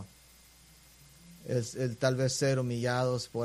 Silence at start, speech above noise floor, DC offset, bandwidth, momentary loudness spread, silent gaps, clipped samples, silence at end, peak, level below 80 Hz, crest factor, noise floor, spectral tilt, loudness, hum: 0 s; 28 dB; under 0.1%; 15 kHz; 6 LU; none; under 0.1%; 0 s; -14 dBFS; -64 dBFS; 20 dB; -58 dBFS; -5 dB/octave; -31 LUFS; none